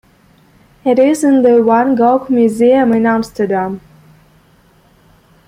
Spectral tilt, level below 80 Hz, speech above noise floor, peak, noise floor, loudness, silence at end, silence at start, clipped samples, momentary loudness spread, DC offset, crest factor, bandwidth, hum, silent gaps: -6.5 dB/octave; -52 dBFS; 38 dB; 0 dBFS; -49 dBFS; -12 LUFS; 1.7 s; 0.85 s; under 0.1%; 8 LU; under 0.1%; 12 dB; 15.5 kHz; none; none